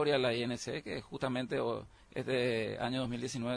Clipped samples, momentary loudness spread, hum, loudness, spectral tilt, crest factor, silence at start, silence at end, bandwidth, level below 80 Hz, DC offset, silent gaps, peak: under 0.1%; 10 LU; none; -36 LUFS; -5 dB/octave; 16 dB; 0 s; 0 s; 10.5 kHz; -64 dBFS; under 0.1%; none; -20 dBFS